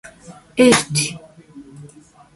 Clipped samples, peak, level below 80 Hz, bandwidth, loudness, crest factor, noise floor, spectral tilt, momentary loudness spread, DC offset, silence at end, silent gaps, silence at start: under 0.1%; 0 dBFS; -54 dBFS; 11.5 kHz; -16 LUFS; 20 dB; -46 dBFS; -3.5 dB/octave; 16 LU; under 0.1%; 0.5 s; none; 0.05 s